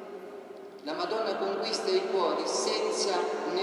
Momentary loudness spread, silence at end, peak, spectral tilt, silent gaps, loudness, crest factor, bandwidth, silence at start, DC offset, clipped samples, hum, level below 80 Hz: 15 LU; 0 s; -16 dBFS; -2 dB/octave; none; -29 LUFS; 16 dB; 12 kHz; 0 s; under 0.1%; under 0.1%; none; under -90 dBFS